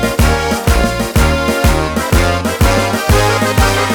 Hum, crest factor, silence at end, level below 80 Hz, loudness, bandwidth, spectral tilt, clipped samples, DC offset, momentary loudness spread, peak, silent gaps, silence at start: none; 12 dB; 0 s; -18 dBFS; -13 LUFS; over 20 kHz; -5 dB/octave; under 0.1%; under 0.1%; 2 LU; 0 dBFS; none; 0 s